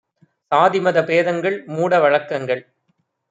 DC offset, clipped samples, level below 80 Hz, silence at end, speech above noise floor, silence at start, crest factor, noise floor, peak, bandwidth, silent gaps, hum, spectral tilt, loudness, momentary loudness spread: under 0.1%; under 0.1%; -70 dBFS; 0.7 s; 51 dB; 0.5 s; 18 dB; -68 dBFS; -2 dBFS; 7.8 kHz; none; none; -6 dB/octave; -18 LUFS; 8 LU